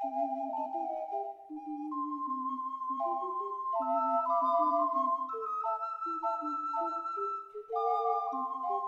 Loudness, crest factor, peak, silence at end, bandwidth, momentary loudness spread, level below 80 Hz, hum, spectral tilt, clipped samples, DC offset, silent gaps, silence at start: -33 LUFS; 16 dB; -18 dBFS; 0 s; 7.2 kHz; 9 LU; -84 dBFS; none; -5.5 dB/octave; under 0.1%; under 0.1%; none; 0 s